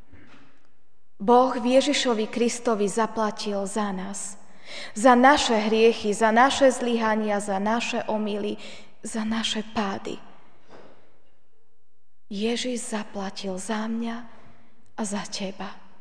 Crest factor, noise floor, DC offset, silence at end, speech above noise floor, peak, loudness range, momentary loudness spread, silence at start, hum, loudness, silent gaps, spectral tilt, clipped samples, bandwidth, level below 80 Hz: 20 dB; -70 dBFS; 1%; 0.25 s; 47 dB; -4 dBFS; 12 LU; 17 LU; 0.15 s; none; -24 LUFS; none; -3.5 dB/octave; under 0.1%; 10 kHz; -58 dBFS